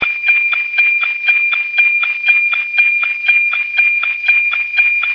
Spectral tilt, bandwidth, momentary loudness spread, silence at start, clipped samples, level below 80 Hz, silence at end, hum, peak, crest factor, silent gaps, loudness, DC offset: -0.5 dB/octave; 5.4 kHz; 2 LU; 0 s; under 0.1%; -62 dBFS; 0 s; none; 0 dBFS; 14 dB; none; -11 LUFS; under 0.1%